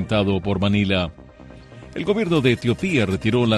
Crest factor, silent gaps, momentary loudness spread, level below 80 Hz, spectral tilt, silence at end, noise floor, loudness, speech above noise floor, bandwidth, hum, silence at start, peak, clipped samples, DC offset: 16 dB; none; 7 LU; -44 dBFS; -6.5 dB/octave; 0 s; -43 dBFS; -21 LUFS; 23 dB; 12 kHz; none; 0 s; -4 dBFS; under 0.1%; under 0.1%